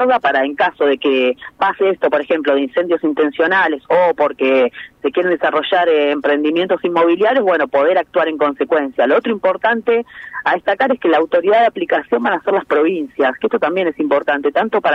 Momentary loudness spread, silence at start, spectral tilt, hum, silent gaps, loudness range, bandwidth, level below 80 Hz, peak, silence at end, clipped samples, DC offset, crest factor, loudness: 4 LU; 0 s; -6.5 dB/octave; none; none; 1 LU; 6 kHz; -60 dBFS; -2 dBFS; 0 s; under 0.1%; under 0.1%; 14 dB; -15 LUFS